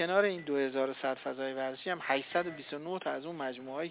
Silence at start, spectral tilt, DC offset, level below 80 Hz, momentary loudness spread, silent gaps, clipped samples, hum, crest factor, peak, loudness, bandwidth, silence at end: 0 s; -2.5 dB/octave; under 0.1%; -82 dBFS; 8 LU; none; under 0.1%; none; 20 dB; -14 dBFS; -35 LUFS; 4 kHz; 0 s